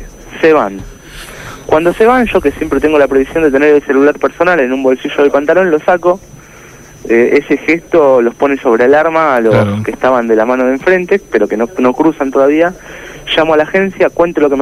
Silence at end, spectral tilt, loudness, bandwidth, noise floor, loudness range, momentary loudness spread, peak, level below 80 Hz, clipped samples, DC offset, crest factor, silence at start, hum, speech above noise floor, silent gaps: 0 s; -6 dB/octave; -10 LUFS; 15 kHz; -35 dBFS; 2 LU; 8 LU; 0 dBFS; -38 dBFS; under 0.1%; under 0.1%; 10 dB; 0 s; none; 25 dB; none